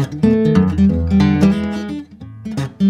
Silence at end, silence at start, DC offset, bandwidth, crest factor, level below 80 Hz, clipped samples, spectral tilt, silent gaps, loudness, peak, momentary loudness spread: 0 s; 0 s; under 0.1%; 10.5 kHz; 14 dB; -32 dBFS; under 0.1%; -8.5 dB/octave; none; -15 LUFS; 0 dBFS; 16 LU